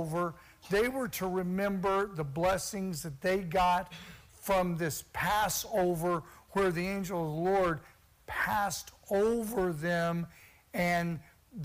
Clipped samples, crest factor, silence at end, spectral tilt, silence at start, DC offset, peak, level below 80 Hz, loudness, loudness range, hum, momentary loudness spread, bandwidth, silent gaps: under 0.1%; 16 dB; 0 s; -5 dB/octave; 0 s; under 0.1%; -16 dBFS; -54 dBFS; -32 LUFS; 1 LU; none; 11 LU; 16 kHz; none